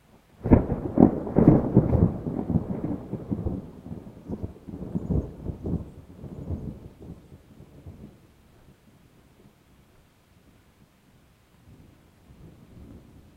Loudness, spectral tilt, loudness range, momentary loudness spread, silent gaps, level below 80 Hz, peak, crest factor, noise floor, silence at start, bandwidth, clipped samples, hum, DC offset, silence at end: -25 LUFS; -11.5 dB/octave; 20 LU; 26 LU; none; -40 dBFS; 0 dBFS; 28 dB; -58 dBFS; 0.4 s; 5 kHz; under 0.1%; none; under 0.1%; 0.35 s